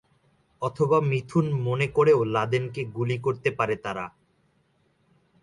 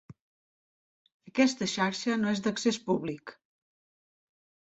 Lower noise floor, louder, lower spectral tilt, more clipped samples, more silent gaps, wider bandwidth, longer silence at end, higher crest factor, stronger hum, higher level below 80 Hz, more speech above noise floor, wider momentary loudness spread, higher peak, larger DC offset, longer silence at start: second, -67 dBFS vs under -90 dBFS; first, -25 LUFS vs -29 LUFS; first, -7.5 dB/octave vs -4.5 dB/octave; neither; second, none vs 0.21-1.05 s, 1.14-1.20 s; first, 11 kHz vs 8.2 kHz; about the same, 1.35 s vs 1.35 s; about the same, 18 dB vs 22 dB; neither; first, -60 dBFS vs -72 dBFS; second, 43 dB vs over 61 dB; about the same, 12 LU vs 11 LU; about the same, -8 dBFS vs -10 dBFS; neither; first, 0.6 s vs 0.1 s